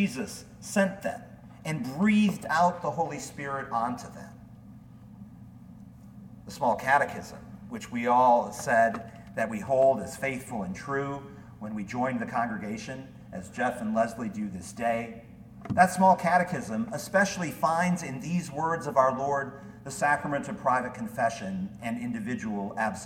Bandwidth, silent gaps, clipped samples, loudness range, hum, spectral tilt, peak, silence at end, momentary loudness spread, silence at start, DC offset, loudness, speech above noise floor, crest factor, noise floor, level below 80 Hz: 17 kHz; none; under 0.1%; 7 LU; none; -5.5 dB/octave; -6 dBFS; 0 s; 20 LU; 0 s; under 0.1%; -28 LUFS; 21 dB; 24 dB; -49 dBFS; -60 dBFS